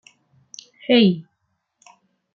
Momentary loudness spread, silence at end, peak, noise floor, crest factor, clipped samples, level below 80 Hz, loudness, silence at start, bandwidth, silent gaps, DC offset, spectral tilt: 26 LU; 1.15 s; -6 dBFS; -73 dBFS; 18 dB; under 0.1%; -68 dBFS; -18 LUFS; 0.9 s; 7.2 kHz; none; under 0.1%; -6 dB/octave